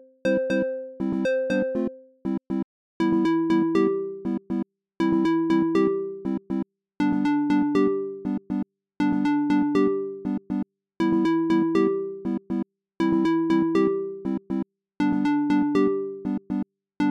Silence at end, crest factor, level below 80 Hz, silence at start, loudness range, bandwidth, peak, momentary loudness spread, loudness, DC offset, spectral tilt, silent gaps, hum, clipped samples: 0 s; 14 dB; -60 dBFS; 0.25 s; 2 LU; 8.2 kHz; -10 dBFS; 9 LU; -25 LUFS; under 0.1%; -8 dB/octave; 2.64-3.00 s; none; under 0.1%